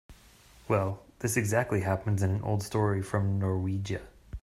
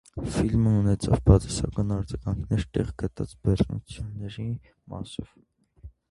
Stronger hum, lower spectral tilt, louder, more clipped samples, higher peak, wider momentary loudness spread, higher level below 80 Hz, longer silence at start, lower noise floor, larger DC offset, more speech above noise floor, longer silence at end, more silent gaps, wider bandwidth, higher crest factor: neither; about the same, -6.5 dB/octave vs -7.5 dB/octave; second, -30 LUFS vs -26 LUFS; neither; second, -12 dBFS vs -2 dBFS; second, 8 LU vs 16 LU; second, -52 dBFS vs -36 dBFS; about the same, 0.1 s vs 0.15 s; first, -56 dBFS vs -49 dBFS; neither; first, 28 dB vs 23 dB; second, 0.05 s vs 0.2 s; neither; first, 15 kHz vs 11.5 kHz; second, 18 dB vs 24 dB